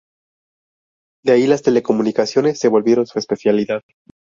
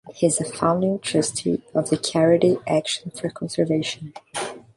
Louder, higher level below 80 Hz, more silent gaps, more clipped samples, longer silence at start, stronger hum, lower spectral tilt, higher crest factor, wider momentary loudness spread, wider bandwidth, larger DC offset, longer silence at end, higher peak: first, -17 LUFS vs -22 LUFS; about the same, -60 dBFS vs -60 dBFS; neither; neither; first, 1.25 s vs 0.05 s; neither; about the same, -5.5 dB/octave vs -4.5 dB/octave; about the same, 16 dB vs 18 dB; second, 8 LU vs 12 LU; second, 7.6 kHz vs 11.5 kHz; neither; first, 0.5 s vs 0.2 s; about the same, -2 dBFS vs -4 dBFS